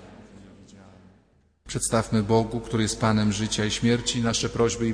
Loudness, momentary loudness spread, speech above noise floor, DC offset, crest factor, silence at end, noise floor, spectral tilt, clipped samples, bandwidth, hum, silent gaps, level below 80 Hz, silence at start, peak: -24 LUFS; 4 LU; 38 dB; under 0.1%; 18 dB; 0 s; -62 dBFS; -4.5 dB/octave; under 0.1%; 11 kHz; none; none; -46 dBFS; 0 s; -8 dBFS